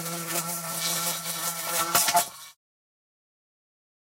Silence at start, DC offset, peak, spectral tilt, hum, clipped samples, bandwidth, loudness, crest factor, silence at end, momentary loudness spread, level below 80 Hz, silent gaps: 0 s; under 0.1%; -6 dBFS; -1 dB/octave; none; under 0.1%; 16 kHz; -26 LUFS; 24 dB; 1.5 s; 8 LU; -74 dBFS; none